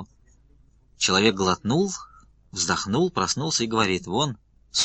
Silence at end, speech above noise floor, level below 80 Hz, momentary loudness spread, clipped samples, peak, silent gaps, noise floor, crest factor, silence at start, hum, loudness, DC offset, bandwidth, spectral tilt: 0 s; 33 dB; -54 dBFS; 9 LU; under 0.1%; -4 dBFS; none; -57 dBFS; 22 dB; 0 s; none; -23 LUFS; under 0.1%; 9.4 kHz; -3.5 dB/octave